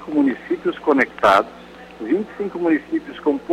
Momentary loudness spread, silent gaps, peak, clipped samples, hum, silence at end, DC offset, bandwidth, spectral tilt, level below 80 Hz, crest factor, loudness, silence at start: 15 LU; none; -2 dBFS; under 0.1%; none; 0 s; under 0.1%; 12.5 kHz; -6 dB/octave; -56 dBFS; 18 dB; -20 LUFS; 0 s